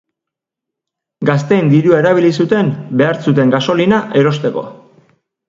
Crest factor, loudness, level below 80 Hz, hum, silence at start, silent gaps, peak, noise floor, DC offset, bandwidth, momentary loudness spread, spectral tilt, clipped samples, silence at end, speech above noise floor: 14 dB; -13 LUFS; -54 dBFS; none; 1.2 s; none; 0 dBFS; -82 dBFS; under 0.1%; 7.6 kHz; 8 LU; -7.5 dB/octave; under 0.1%; 0.75 s; 70 dB